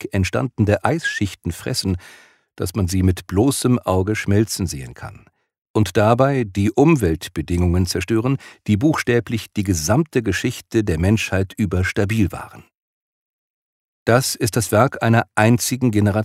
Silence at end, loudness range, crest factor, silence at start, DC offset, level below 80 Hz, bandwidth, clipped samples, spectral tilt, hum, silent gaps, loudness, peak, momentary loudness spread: 0 s; 3 LU; 18 dB; 0 s; under 0.1%; -40 dBFS; 16 kHz; under 0.1%; -5.5 dB/octave; none; 5.58-5.62 s, 5.69-5.74 s, 12.80-14.06 s; -19 LUFS; 0 dBFS; 9 LU